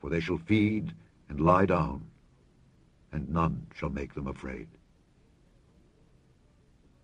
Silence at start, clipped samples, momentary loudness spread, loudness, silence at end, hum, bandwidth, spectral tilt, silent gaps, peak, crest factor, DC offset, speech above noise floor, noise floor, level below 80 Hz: 0.05 s; under 0.1%; 17 LU; -30 LUFS; 2.4 s; none; 9 kHz; -8.5 dB/octave; none; -10 dBFS; 22 dB; under 0.1%; 34 dB; -63 dBFS; -48 dBFS